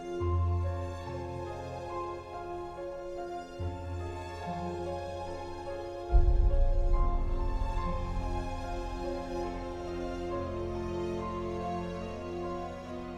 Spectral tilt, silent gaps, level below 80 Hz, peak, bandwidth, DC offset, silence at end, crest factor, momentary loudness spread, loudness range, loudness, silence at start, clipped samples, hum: -7.5 dB/octave; none; -34 dBFS; -12 dBFS; 8.4 kHz; under 0.1%; 0 s; 20 dB; 9 LU; 6 LU; -36 LUFS; 0 s; under 0.1%; none